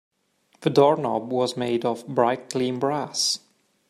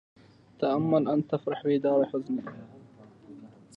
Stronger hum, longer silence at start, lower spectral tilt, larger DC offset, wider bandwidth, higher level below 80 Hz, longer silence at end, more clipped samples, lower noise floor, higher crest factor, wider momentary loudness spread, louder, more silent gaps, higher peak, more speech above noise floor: neither; about the same, 0.6 s vs 0.6 s; second, -4.5 dB/octave vs -9 dB/octave; neither; first, 14.5 kHz vs 5.6 kHz; about the same, -70 dBFS vs -74 dBFS; first, 0.5 s vs 0.3 s; neither; first, -65 dBFS vs -53 dBFS; about the same, 20 dB vs 18 dB; second, 7 LU vs 23 LU; first, -23 LUFS vs -28 LUFS; neither; first, -4 dBFS vs -12 dBFS; first, 42 dB vs 26 dB